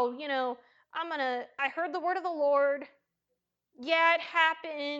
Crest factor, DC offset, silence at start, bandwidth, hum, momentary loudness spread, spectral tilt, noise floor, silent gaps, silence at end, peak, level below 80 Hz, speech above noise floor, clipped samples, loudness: 20 dB; under 0.1%; 0 s; 7.8 kHz; none; 12 LU; -2.5 dB/octave; -84 dBFS; none; 0 s; -10 dBFS; -88 dBFS; 54 dB; under 0.1%; -29 LUFS